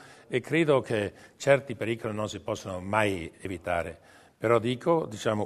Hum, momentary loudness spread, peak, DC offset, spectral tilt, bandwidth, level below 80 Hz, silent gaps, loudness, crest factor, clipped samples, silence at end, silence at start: none; 10 LU; -6 dBFS; under 0.1%; -5.5 dB/octave; 13.5 kHz; -60 dBFS; none; -28 LUFS; 22 dB; under 0.1%; 0 s; 0 s